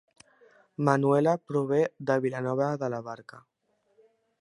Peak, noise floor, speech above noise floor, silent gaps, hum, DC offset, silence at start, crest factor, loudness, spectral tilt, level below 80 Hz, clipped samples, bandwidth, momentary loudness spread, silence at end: -6 dBFS; -71 dBFS; 44 dB; none; none; under 0.1%; 0.8 s; 22 dB; -27 LUFS; -8 dB/octave; -76 dBFS; under 0.1%; 11 kHz; 15 LU; 1 s